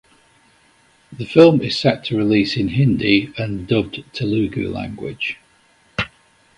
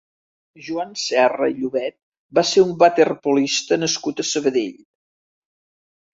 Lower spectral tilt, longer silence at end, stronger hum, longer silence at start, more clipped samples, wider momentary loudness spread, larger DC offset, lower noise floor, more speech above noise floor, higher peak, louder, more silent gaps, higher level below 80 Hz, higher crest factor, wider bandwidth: first, -7 dB/octave vs -3.5 dB/octave; second, 0.5 s vs 1.45 s; neither; first, 1.1 s vs 0.6 s; neither; about the same, 15 LU vs 13 LU; neither; second, -56 dBFS vs under -90 dBFS; second, 38 dB vs over 71 dB; about the same, 0 dBFS vs -2 dBFS; about the same, -18 LUFS vs -19 LUFS; second, none vs 2.03-2.12 s, 2.18-2.29 s; first, -46 dBFS vs -66 dBFS; about the same, 20 dB vs 18 dB; first, 11 kHz vs 7.8 kHz